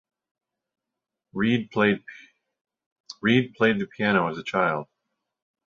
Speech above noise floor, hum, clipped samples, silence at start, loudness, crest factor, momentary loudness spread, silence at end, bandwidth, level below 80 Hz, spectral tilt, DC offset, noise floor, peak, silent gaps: 63 dB; none; under 0.1%; 1.35 s; -24 LUFS; 22 dB; 11 LU; 0.8 s; 7.4 kHz; -64 dBFS; -6.5 dB/octave; under 0.1%; -86 dBFS; -4 dBFS; 2.61-2.65 s, 2.86-3.04 s